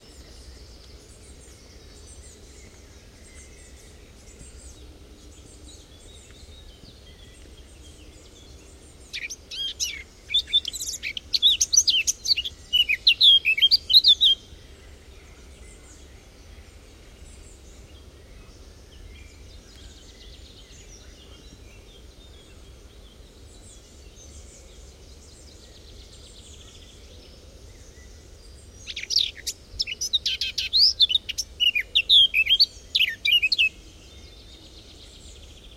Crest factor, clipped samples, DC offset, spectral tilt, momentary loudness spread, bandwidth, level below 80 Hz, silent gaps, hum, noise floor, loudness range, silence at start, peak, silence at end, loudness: 22 dB; under 0.1%; under 0.1%; 1.5 dB/octave; 18 LU; 16 kHz; -48 dBFS; none; none; -48 dBFS; 15 LU; 0.2 s; -4 dBFS; 0.45 s; -19 LUFS